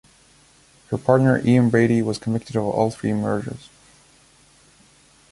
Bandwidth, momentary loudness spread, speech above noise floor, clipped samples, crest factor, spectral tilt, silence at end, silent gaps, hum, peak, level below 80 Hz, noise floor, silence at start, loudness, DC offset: 11.5 kHz; 11 LU; 35 dB; under 0.1%; 20 dB; -7.5 dB/octave; 1.75 s; none; none; -2 dBFS; -54 dBFS; -54 dBFS; 0.9 s; -20 LUFS; under 0.1%